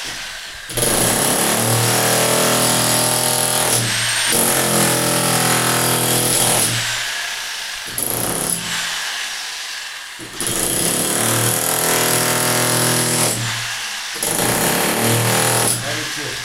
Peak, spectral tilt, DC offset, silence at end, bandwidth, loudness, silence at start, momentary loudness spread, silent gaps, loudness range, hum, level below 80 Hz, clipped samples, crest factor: -2 dBFS; -2 dB/octave; under 0.1%; 0 s; 17 kHz; -16 LUFS; 0 s; 9 LU; none; 5 LU; none; -46 dBFS; under 0.1%; 16 dB